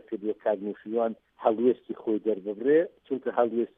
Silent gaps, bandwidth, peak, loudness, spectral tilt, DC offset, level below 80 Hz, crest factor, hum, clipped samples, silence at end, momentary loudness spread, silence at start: none; 3.8 kHz; -10 dBFS; -28 LUFS; -10 dB/octave; under 0.1%; -78 dBFS; 18 dB; none; under 0.1%; 0.1 s; 8 LU; 0.1 s